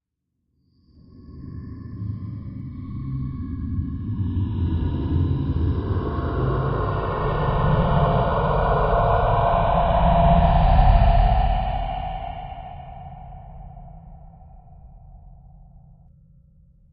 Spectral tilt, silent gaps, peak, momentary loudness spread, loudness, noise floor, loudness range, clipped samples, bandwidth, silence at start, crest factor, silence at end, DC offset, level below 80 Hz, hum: -12 dB/octave; none; -4 dBFS; 20 LU; -22 LUFS; -76 dBFS; 16 LU; under 0.1%; 5 kHz; 1.2 s; 18 dB; 1.35 s; under 0.1%; -26 dBFS; none